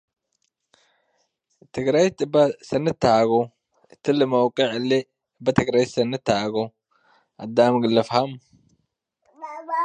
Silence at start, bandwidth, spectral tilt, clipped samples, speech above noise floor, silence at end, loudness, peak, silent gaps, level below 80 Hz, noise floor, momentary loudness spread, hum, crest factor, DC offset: 1.75 s; 9.8 kHz; -6 dB/octave; under 0.1%; 54 dB; 0 s; -21 LUFS; -2 dBFS; none; -58 dBFS; -74 dBFS; 14 LU; none; 20 dB; under 0.1%